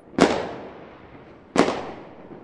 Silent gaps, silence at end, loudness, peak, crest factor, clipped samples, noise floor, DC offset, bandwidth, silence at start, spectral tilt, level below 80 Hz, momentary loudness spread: none; 0.05 s; -23 LUFS; 0 dBFS; 26 dB; under 0.1%; -46 dBFS; under 0.1%; 11.5 kHz; 0.15 s; -5 dB/octave; -54 dBFS; 24 LU